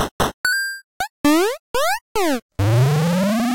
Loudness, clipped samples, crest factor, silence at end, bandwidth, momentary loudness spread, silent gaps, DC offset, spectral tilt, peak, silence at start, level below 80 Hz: -20 LUFS; under 0.1%; 10 dB; 0 s; 17 kHz; 6 LU; 0.11-0.19 s, 0.34-0.44 s, 0.84-1.00 s, 1.10-1.24 s, 1.59-1.74 s, 2.01-2.15 s, 2.42-2.49 s; under 0.1%; -5 dB/octave; -8 dBFS; 0 s; -42 dBFS